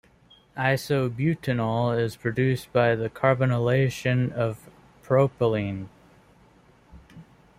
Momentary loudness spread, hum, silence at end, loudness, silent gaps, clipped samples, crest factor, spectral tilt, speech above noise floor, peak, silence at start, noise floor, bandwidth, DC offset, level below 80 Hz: 7 LU; none; 0.35 s; -25 LUFS; none; under 0.1%; 20 dB; -7 dB/octave; 33 dB; -6 dBFS; 0.55 s; -57 dBFS; 15.5 kHz; under 0.1%; -56 dBFS